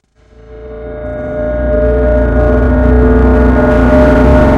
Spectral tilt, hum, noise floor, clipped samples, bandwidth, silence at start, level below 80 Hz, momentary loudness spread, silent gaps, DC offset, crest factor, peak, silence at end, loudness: -9.5 dB/octave; none; -39 dBFS; 0.6%; 5.4 kHz; 0.5 s; -14 dBFS; 15 LU; none; under 0.1%; 8 dB; 0 dBFS; 0 s; -9 LUFS